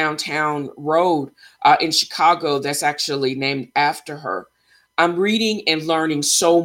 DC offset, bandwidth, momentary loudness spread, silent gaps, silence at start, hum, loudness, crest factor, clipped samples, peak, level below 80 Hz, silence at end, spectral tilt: under 0.1%; 17 kHz; 11 LU; none; 0 s; none; -19 LUFS; 18 dB; under 0.1%; -2 dBFS; -66 dBFS; 0 s; -3 dB/octave